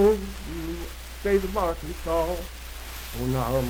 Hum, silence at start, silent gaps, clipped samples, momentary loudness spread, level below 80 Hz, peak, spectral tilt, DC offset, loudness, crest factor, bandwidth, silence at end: none; 0 s; none; under 0.1%; 13 LU; -36 dBFS; -10 dBFS; -6 dB/octave; under 0.1%; -28 LUFS; 16 dB; 18.5 kHz; 0 s